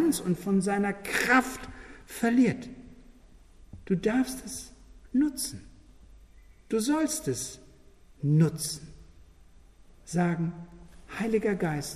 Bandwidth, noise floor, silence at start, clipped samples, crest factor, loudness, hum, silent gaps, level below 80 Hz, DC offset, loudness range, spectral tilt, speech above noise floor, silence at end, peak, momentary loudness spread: 15 kHz; -54 dBFS; 0 s; under 0.1%; 20 dB; -28 LUFS; none; none; -54 dBFS; under 0.1%; 4 LU; -5.5 dB/octave; 27 dB; 0 s; -8 dBFS; 20 LU